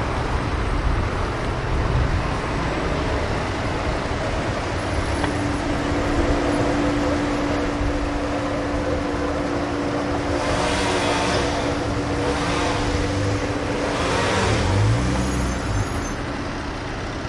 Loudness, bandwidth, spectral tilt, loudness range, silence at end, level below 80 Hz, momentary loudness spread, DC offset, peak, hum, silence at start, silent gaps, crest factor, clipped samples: -23 LUFS; 11.5 kHz; -5.5 dB/octave; 2 LU; 0 s; -30 dBFS; 4 LU; under 0.1%; -8 dBFS; none; 0 s; none; 14 dB; under 0.1%